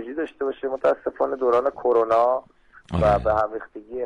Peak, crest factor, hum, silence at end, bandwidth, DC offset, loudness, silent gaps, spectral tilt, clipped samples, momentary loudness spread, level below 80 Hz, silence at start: -10 dBFS; 14 dB; none; 0 s; 9.8 kHz; under 0.1%; -22 LUFS; none; -8 dB/octave; under 0.1%; 10 LU; -42 dBFS; 0 s